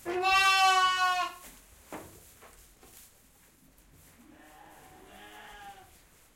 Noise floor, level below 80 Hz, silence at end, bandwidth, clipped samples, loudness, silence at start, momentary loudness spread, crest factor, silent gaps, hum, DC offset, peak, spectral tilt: -61 dBFS; -64 dBFS; 0.65 s; 16.5 kHz; under 0.1%; -25 LUFS; 0.05 s; 27 LU; 20 dB; none; none; under 0.1%; -14 dBFS; -0.5 dB/octave